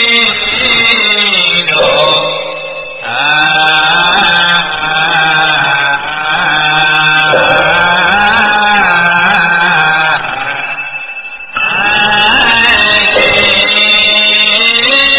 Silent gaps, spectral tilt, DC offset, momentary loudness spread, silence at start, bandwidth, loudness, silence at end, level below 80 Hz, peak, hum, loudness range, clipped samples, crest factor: none; -6 dB/octave; 1%; 10 LU; 0 s; 4 kHz; -7 LUFS; 0 s; -40 dBFS; 0 dBFS; none; 4 LU; 0.3%; 10 dB